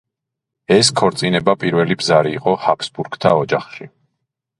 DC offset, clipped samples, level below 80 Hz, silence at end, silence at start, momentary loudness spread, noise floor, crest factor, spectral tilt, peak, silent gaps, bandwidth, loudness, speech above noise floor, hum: under 0.1%; under 0.1%; -54 dBFS; 0.7 s; 0.7 s; 9 LU; -81 dBFS; 18 dB; -4.5 dB/octave; 0 dBFS; none; 11.5 kHz; -16 LUFS; 65 dB; none